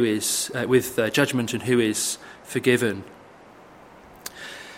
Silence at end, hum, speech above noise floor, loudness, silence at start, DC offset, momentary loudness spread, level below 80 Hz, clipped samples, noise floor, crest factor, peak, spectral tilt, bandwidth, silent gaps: 0 s; none; 25 dB; -23 LUFS; 0 s; under 0.1%; 15 LU; -62 dBFS; under 0.1%; -48 dBFS; 22 dB; -4 dBFS; -4 dB/octave; 16.5 kHz; none